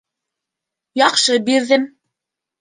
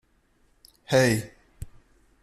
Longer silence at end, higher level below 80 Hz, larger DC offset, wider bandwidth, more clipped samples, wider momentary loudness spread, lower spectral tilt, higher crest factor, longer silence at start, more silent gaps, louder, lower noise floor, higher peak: first, 0.75 s vs 0.55 s; second, -74 dBFS vs -52 dBFS; neither; second, 10 kHz vs 13.5 kHz; neither; second, 12 LU vs 24 LU; second, -1.5 dB/octave vs -5 dB/octave; about the same, 18 dB vs 20 dB; about the same, 0.95 s vs 0.9 s; neither; first, -15 LUFS vs -23 LUFS; first, -83 dBFS vs -65 dBFS; first, -2 dBFS vs -8 dBFS